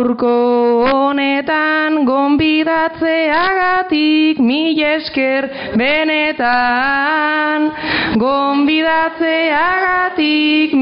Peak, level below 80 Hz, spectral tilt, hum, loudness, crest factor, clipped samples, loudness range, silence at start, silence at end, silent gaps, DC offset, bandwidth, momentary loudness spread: -4 dBFS; -48 dBFS; -1.5 dB/octave; none; -14 LUFS; 10 dB; under 0.1%; 1 LU; 0 s; 0 s; none; under 0.1%; 5.4 kHz; 3 LU